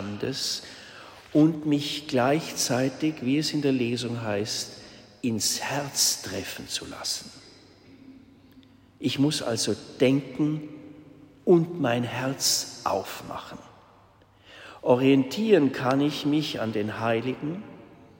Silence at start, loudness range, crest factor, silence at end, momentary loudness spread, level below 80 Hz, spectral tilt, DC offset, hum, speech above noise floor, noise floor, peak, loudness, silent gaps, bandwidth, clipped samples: 0 s; 5 LU; 20 dB; 0.25 s; 16 LU; -64 dBFS; -4 dB/octave; under 0.1%; none; 31 dB; -57 dBFS; -6 dBFS; -26 LUFS; none; 16.5 kHz; under 0.1%